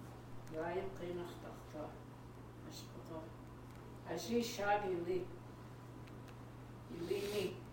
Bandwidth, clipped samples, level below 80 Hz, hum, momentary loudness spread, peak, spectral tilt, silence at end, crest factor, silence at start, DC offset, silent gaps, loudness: 17 kHz; under 0.1%; -64 dBFS; none; 16 LU; -22 dBFS; -5 dB/octave; 0 s; 22 dB; 0 s; under 0.1%; none; -44 LUFS